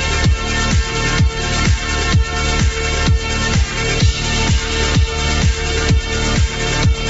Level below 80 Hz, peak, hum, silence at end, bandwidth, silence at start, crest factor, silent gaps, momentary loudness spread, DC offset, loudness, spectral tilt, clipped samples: -20 dBFS; -2 dBFS; none; 0 s; 8 kHz; 0 s; 12 dB; none; 2 LU; under 0.1%; -16 LUFS; -4 dB/octave; under 0.1%